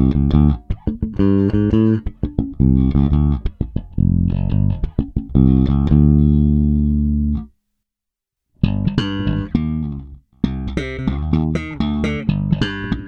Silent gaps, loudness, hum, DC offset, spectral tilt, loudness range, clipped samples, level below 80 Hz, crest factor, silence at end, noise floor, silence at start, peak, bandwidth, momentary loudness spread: none; -18 LUFS; none; under 0.1%; -9 dB/octave; 6 LU; under 0.1%; -24 dBFS; 16 dB; 0 s; -83 dBFS; 0 s; 0 dBFS; 6.6 kHz; 10 LU